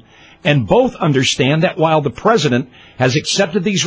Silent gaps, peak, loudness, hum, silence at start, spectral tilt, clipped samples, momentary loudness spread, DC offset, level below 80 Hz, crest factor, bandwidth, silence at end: none; 0 dBFS; -15 LUFS; none; 0.45 s; -5 dB/octave; under 0.1%; 5 LU; under 0.1%; -44 dBFS; 16 dB; 8 kHz; 0 s